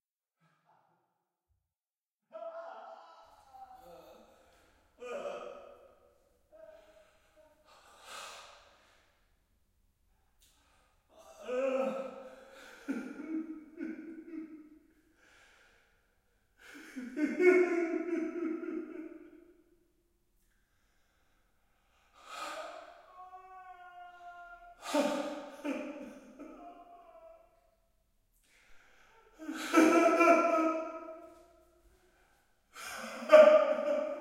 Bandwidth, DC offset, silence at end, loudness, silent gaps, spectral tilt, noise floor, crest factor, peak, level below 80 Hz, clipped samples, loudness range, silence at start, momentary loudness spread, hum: 15.5 kHz; under 0.1%; 0 s; -30 LUFS; none; -3.5 dB/octave; under -90 dBFS; 28 dB; -8 dBFS; -76 dBFS; under 0.1%; 24 LU; 2.35 s; 27 LU; none